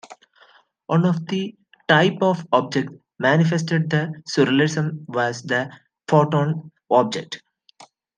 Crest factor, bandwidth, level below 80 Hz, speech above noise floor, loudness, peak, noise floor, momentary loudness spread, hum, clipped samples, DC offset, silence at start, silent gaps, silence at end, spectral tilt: 20 dB; 9.4 kHz; -68 dBFS; 35 dB; -21 LUFS; -2 dBFS; -55 dBFS; 14 LU; none; under 0.1%; under 0.1%; 0.1 s; none; 0.35 s; -6 dB/octave